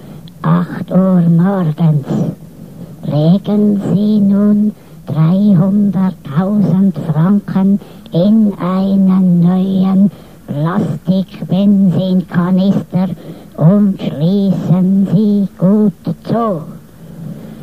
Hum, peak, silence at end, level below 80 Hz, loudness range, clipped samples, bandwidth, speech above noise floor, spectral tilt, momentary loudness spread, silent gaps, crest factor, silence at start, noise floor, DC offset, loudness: none; 0 dBFS; 0 s; -48 dBFS; 2 LU; under 0.1%; 5 kHz; 20 dB; -10 dB/octave; 11 LU; none; 12 dB; 0 s; -32 dBFS; 0.6%; -13 LUFS